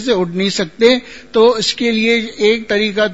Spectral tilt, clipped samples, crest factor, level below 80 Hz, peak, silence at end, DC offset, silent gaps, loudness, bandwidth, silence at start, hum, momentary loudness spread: -4 dB/octave; under 0.1%; 14 dB; -50 dBFS; 0 dBFS; 0 s; 0.6%; none; -14 LUFS; 8 kHz; 0 s; none; 5 LU